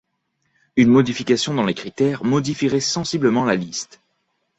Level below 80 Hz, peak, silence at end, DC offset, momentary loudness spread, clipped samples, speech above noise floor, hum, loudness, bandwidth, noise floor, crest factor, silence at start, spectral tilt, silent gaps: -56 dBFS; -2 dBFS; 0.75 s; under 0.1%; 9 LU; under 0.1%; 52 dB; none; -19 LUFS; 8.2 kHz; -71 dBFS; 18 dB; 0.75 s; -5 dB/octave; none